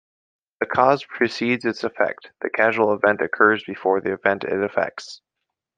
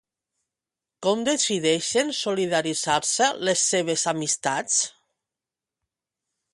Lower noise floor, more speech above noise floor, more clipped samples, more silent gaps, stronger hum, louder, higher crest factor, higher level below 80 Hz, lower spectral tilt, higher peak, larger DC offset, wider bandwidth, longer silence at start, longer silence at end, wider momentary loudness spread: second, -82 dBFS vs -89 dBFS; second, 61 dB vs 66 dB; neither; neither; neither; about the same, -21 LUFS vs -23 LUFS; about the same, 20 dB vs 18 dB; about the same, -68 dBFS vs -68 dBFS; first, -5.5 dB/octave vs -2 dB/octave; first, -2 dBFS vs -8 dBFS; neither; second, 9.2 kHz vs 11.5 kHz; second, 0.6 s vs 1 s; second, 0.65 s vs 1.65 s; first, 10 LU vs 4 LU